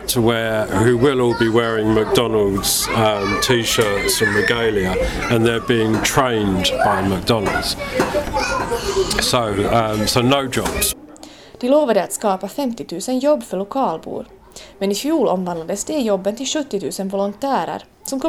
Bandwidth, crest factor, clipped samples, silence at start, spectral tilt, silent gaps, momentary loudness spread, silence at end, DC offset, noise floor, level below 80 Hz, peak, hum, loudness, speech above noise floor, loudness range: 17.5 kHz; 16 dB; under 0.1%; 0 s; -4 dB/octave; none; 8 LU; 0 s; under 0.1%; -40 dBFS; -38 dBFS; -2 dBFS; none; -18 LUFS; 22 dB; 5 LU